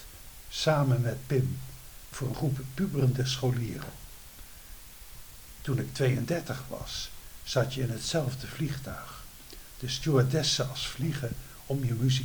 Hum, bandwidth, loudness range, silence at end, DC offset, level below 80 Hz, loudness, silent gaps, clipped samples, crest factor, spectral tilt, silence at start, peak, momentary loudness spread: none; over 20 kHz; 4 LU; 0 s; under 0.1%; -50 dBFS; -30 LUFS; none; under 0.1%; 20 dB; -5.5 dB/octave; 0 s; -12 dBFS; 21 LU